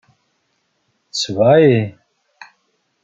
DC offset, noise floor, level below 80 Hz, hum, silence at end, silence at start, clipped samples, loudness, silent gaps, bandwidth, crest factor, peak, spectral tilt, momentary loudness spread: under 0.1%; -67 dBFS; -60 dBFS; none; 1.15 s; 1.15 s; under 0.1%; -15 LUFS; none; 9.2 kHz; 16 dB; -2 dBFS; -6 dB/octave; 15 LU